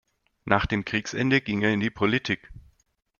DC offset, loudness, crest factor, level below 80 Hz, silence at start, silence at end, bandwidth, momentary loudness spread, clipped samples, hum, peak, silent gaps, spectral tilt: under 0.1%; -25 LUFS; 24 dB; -46 dBFS; 0.45 s; 0.6 s; 7.2 kHz; 7 LU; under 0.1%; none; -2 dBFS; none; -5.5 dB/octave